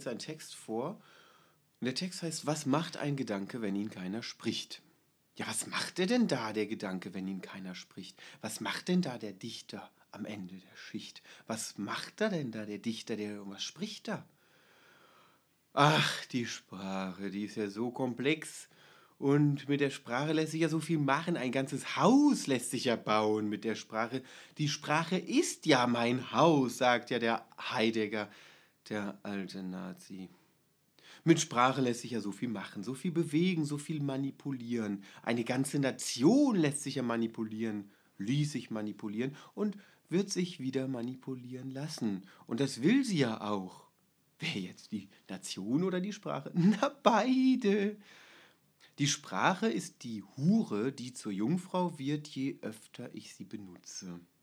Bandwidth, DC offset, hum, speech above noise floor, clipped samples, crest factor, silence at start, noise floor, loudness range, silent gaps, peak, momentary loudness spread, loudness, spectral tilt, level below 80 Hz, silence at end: over 20 kHz; under 0.1%; none; 39 dB; under 0.1%; 26 dB; 0 s; -72 dBFS; 8 LU; none; -8 dBFS; 16 LU; -33 LUFS; -5 dB/octave; -90 dBFS; 0.2 s